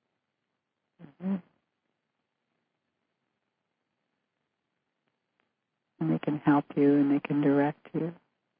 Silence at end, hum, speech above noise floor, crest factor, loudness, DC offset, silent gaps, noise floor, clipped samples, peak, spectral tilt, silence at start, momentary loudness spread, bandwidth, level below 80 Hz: 0.45 s; none; 57 dB; 20 dB; -28 LUFS; under 0.1%; none; -84 dBFS; under 0.1%; -12 dBFS; -11.5 dB/octave; 1 s; 11 LU; 3.9 kHz; -78 dBFS